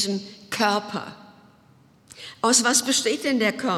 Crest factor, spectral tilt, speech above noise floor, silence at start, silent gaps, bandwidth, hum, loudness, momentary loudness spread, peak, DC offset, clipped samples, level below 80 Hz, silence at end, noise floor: 20 dB; -2 dB/octave; 32 dB; 0 s; none; 17 kHz; none; -22 LUFS; 19 LU; -4 dBFS; under 0.1%; under 0.1%; -70 dBFS; 0 s; -56 dBFS